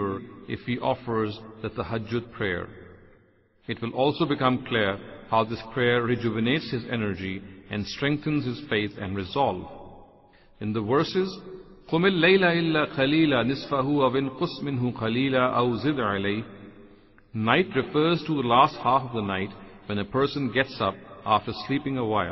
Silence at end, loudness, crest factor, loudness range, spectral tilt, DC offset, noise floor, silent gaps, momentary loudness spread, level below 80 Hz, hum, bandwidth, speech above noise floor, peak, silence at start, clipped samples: 0 s; -25 LUFS; 22 dB; 6 LU; -7.5 dB/octave; under 0.1%; -61 dBFS; none; 13 LU; -54 dBFS; none; 6 kHz; 36 dB; -4 dBFS; 0 s; under 0.1%